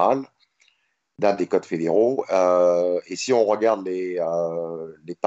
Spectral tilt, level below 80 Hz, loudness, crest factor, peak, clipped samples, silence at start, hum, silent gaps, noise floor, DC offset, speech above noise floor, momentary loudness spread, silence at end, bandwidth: -5 dB/octave; -74 dBFS; -22 LUFS; 18 dB; -4 dBFS; under 0.1%; 0 s; none; none; -67 dBFS; under 0.1%; 46 dB; 11 LU; 0.1 s; 8.2 kHz